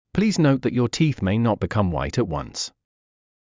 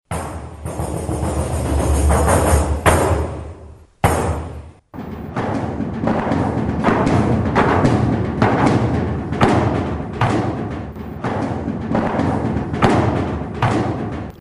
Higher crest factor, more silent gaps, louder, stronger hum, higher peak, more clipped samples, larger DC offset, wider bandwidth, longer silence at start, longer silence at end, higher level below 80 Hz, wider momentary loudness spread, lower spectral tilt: about the same, 16 dB vs 16 dB; neither; second, -22 LUFS vs -19 LUFS; neither; second, -6 dBFS vs -2 dBFS; neither; neither; second, 7.6 kHz vs 12.5 kHz; about the same, 0.15 s vs 0.1 s; first, 0.85 s vs 0.05 s; second, -40 dBFS vs -28 dBFS; second, 9 LU vs 12 LU; about the same, -6 dB/octave vs -6.5 dB/octave